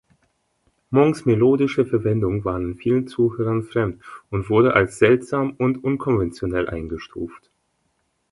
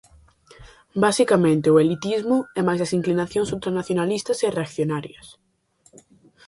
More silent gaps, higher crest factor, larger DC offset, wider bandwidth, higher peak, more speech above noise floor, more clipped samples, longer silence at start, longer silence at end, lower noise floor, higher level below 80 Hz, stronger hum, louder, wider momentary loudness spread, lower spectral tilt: neither; about the same, 20 dB vs 18 dB; neither; about the same, 11.5 kHz vs 11.5 kHz; about the same, -2 dBFS vs -4 dBFS; first, 50 dB vs 40 dB; neither; first, 0.9 s vs 0.6 s; second, 0.95 s vs 1.15 s; first, -70 dBFS vs -61 dBFS; first, -44 dBFS vs -56 dBFS; neither; about the same, -21 LUFS vs -21 LUFS; first, 13 LU vs 9 LU; first, -8 dB/octave vs -6 dB/octave